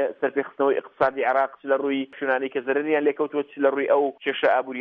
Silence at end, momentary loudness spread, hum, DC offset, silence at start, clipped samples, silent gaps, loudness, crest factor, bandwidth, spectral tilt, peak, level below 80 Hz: 0 s; 5 LU; none; under 0.1%; 0 s; under 0.1%; none; -24 LUFS; 16 dB; 5 kHz; -7 dB/octave; -8 dBFS; -70 dBFS